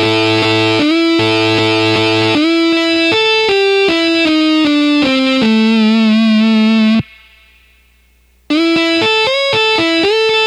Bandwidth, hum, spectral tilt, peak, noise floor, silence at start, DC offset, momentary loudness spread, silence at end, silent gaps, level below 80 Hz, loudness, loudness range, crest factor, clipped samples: 12 kHz; 60 Hz at -50 dBFS; -5 dB/octave; -2 dBFS; -51 dBFS; 0 s; under 0.1%; 1 LU; 0 s; none; -48 dBFS; -11 LUFS; 3 LU; 10 dB; under 0.1%